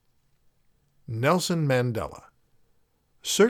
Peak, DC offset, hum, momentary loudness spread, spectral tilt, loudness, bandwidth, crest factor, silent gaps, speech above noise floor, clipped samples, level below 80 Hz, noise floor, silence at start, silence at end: -8 dBFS; under 0.1%; none; 13 LU; -5 dB/octave; -26 LUFS; 18.5 kHz; 18 dB; none; 41 dB; under 0.1%; -58 dBFS; -66 dBFS; 1.1 s; 0 s